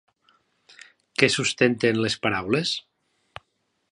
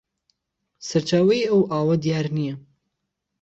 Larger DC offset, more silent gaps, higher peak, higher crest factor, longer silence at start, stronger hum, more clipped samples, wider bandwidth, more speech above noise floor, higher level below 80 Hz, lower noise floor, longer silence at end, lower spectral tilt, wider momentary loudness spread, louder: neither; neither; first, 0 dBFS vs -8 dBFS; first, 26 dB vs 16 dB; first, 1.2 s vs 0.8 s; neither; neither; first, 11.5 kHz vs 8.2 kHz; second, 51 dB vs 59 dB; about the same, -60 dBFS vs -62 dBFS; second, -73 dBFS vs -79 dBFS; first, 1.1 s vs 0.85 s; second, -4 dB/octave vs -6.5 dB/octave; second, 8 LU vs 12 LU; about the same, -23 LUFS vs -21 LUFS